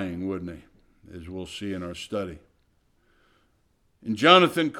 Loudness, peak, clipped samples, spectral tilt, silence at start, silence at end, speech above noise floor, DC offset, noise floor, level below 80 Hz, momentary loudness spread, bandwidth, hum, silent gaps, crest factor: -23 LUFS; -4 dBFS; under 0.1%; -5 dB/octave; 0 s; 0 s; 43 dB; under 0.1%; -67 dBFS; -58 dBFS; 24 LU; 16.5 kHz; none; none; 24 dB